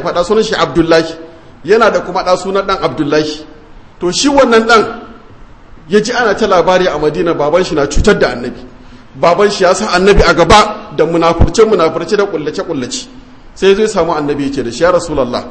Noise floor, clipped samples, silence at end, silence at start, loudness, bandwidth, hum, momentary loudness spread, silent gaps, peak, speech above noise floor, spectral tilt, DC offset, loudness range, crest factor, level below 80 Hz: -36 dBFS; 0.5%; 0 s; 0 s; -11 LUFS; 11 kHz; none; 11 LU; none; 0 dBFS; 25 dB; -4.5 dB/octave; 0.7%; 4 LU; 12 dB; -26 dBFS